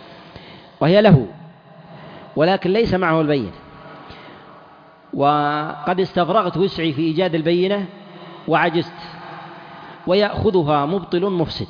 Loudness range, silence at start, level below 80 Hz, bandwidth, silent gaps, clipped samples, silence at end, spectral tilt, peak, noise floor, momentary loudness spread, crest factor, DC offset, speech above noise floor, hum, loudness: 4 LU; 0 s; -48 dBFS; 5.2 kHz; none; under 0.1%; 0.05 s; -8.5 dB/octave; -2 dBFS; -46 dBFS; 22 LU; 16 dB; under 0.1%; 29 dB; none; -18 LUFS